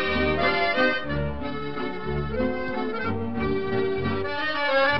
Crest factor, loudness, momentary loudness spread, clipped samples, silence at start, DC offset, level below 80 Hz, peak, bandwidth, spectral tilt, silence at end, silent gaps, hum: 16 dB; -26 LUFS; 9 LU; under 0.1%; 0 s; 2%; -42 dBFS; -8 dBFS; 6 kHz; -7.5 dB/octave; 0 s; none; none